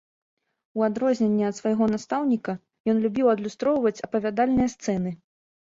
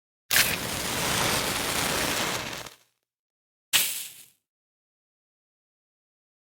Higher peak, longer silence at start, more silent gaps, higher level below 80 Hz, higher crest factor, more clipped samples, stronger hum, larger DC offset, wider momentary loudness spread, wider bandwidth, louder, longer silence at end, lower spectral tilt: second, -10 dBFS vs -6 dBFS; first, 0.75 s vs 0.3 s; second, 2.80-2.84 s vs 3.19-3.72 s; about the same, -56 dBFS vs -54 dBFS; second, 16 dB vs 26 dB; neither; neither; neither; second, 7 LU vs 13 LU; second, 7.8 kHz vs over 20 kHz; about the same, -25 LUFS vs -25 LUFS; second, 0.5 s vs 2.25 s; first, -6.5 dB/octave vs -1.5 dB/octave